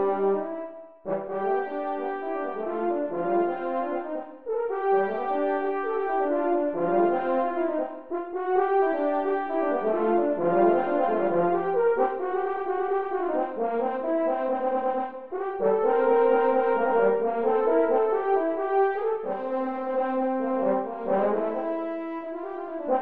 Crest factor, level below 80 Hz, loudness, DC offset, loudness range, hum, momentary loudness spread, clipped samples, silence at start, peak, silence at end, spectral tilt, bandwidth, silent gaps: 16 dB; -68 dBFS; -26 LUFS; 0.5%; 5 LU; none; 10 LU; under 0.1%; 0 s; -10 dBFS; 0 s; -10 dB/octave; 4.5 kHz; none